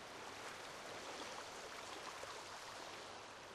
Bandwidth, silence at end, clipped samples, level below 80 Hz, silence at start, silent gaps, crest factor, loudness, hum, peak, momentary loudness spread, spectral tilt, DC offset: 15 kHz; 0 s; under 0.1%; -78 dBFS; 0 s; none; 16 dB; -50 LUFS; none; -36 dBFS; 3 LU; -1.5 dB/octave; under 0.1%